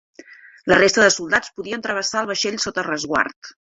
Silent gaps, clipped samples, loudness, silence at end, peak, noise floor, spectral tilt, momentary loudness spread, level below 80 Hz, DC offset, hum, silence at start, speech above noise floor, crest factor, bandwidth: 3.36-3.42 s; under 0.1%; -19 LUFS; 0.15 s; -2 dBFS; -45 dBFS; -2.5 dB/octave; 11 LU; -54 dBFS; under 0.1%; none; 0.3 s; 25 dB; 20 dB; 8.2 kHz